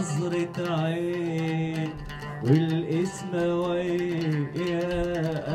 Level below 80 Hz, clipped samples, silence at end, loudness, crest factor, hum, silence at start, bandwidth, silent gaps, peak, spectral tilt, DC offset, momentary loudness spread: -48 dBFS; under 0.1%; 0 s; -27 LUFS; 18 dB; none; 0 s; 12.5 kHz; none; -8 dBFS; -7 dB/octave; under 0.1%; 6 LU